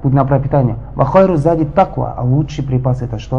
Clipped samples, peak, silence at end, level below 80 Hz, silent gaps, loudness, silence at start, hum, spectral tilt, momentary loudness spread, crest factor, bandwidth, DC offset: under 0.1%; 0 dBFS; 0 s; -32 dBFS; none; -14 LUFS; 0 s; none; -9.5 dB/octave; 7 LU; 14 dB; 7.2 kHz; 1%